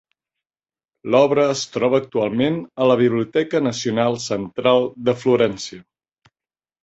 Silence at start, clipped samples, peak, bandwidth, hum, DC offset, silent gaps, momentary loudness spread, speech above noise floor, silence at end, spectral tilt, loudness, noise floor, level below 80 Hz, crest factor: 1.05 s; under 0.1%; -2 dBFS; 8.2 kHz; none; under 0.1%; none; 6 LU; over 71 dB; 1.05 s; -5.5 dB/octave; -19 LUFS; under -90 dBFS; -60 dBFS; 18 dB